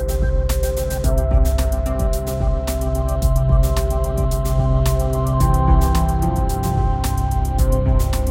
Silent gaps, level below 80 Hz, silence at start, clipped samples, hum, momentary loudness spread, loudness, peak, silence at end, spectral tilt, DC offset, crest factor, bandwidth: none; -18 dBFS; 0 s; under 0.1%; none; 5 LU; -19 LUFS; -4 dBFS; 0 s; -6.5 dB/octave; under 0.1%; 12 dB; 17 kHz